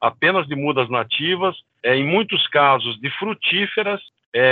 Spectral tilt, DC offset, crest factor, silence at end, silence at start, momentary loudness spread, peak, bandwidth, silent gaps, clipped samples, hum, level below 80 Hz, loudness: -7.5 dB/octave; under 0.1%; 18 dB; 0 s; 0 s; 9 LU; -2 dBFS; 4.8 kHz; 4.26-4.32 s; under 0.1%; none; -68 dBFS; -19 LUFS